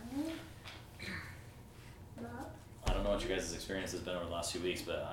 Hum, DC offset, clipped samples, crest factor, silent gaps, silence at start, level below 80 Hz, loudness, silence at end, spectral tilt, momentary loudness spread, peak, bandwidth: none; under 0.1%; under 0.1%; 20 dB; none; 0 s; -48 dBFS; -41 LUFS; 0 s; -4 dB/octave; 17 LU; -20 dBFS; 18 kHz